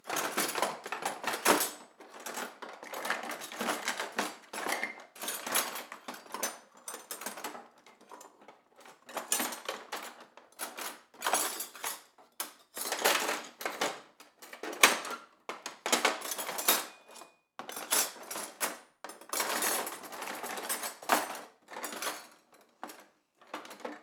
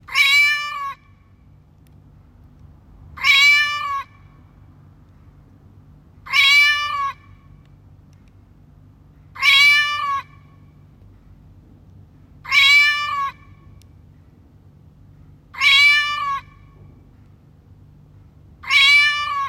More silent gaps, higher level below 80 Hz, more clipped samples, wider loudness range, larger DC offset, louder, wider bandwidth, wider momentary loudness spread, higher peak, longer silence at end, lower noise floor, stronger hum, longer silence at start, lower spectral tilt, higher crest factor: neither; second, under -90 dBFS vs -54 dBFS; neither; first, 8 LU vs 1 LU; neither; second, -33 LUFS vs -14 LUFS; first, over 20 kHz vs 16.5 kHz; first, 20 LU vs 17 LU; about the same, -2 dBFS vs -2 dBFS; about the same, 0 s vs 0 s; first, -63 dBFS vs -50 dBFS; neither; about the same, 0.05 s vs 0.1 s; about the same, 0 dB/octave vs 1 dB/octave; first, 34 dB vs 18 dB